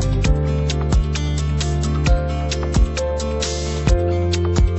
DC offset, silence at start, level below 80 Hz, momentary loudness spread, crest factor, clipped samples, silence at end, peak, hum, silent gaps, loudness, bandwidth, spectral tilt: under 0.1%; 0 s; -20 dBFS; 3 LU; 14 dB; under 0.1%; 0 s; -4 dBFS; none; none; -20 LUFS; 8.4 kHz; -5.5 dB/octave